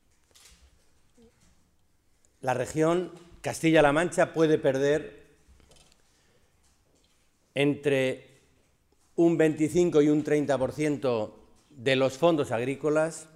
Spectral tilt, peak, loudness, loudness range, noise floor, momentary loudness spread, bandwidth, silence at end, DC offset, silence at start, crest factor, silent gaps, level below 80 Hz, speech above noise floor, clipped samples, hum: -6 dB/octave; -8 dBFS; -26 LUFS; 7 LU; -67 dBFS; 13 LU; 14.5 kHz; 0.1 s; under 0.1%; 2.45 s; 20 dB; none; -58 dBFS; 41 dB; under 0.1%; none